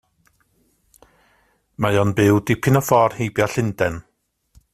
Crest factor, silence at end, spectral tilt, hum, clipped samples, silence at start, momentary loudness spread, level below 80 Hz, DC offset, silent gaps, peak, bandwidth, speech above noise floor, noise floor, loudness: 18 dB; 0.7 s; -6 dB/octave; none; under 0.1%; 1.8 s; 8 LU; -50 dBFS; under 0.1%; none; -2 dBFS; 16 kHz; 45 dB; -63 dBFS; -19 LUFS